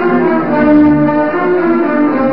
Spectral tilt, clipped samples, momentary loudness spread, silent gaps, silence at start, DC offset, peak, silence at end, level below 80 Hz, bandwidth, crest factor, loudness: -13 dB/octave; under 0.1%; 4 LU; none; 0 s; 2%; 0 dBFS; 0 s; -40 dBFS; 5.4 kHz; 10 dB; -11 LUFS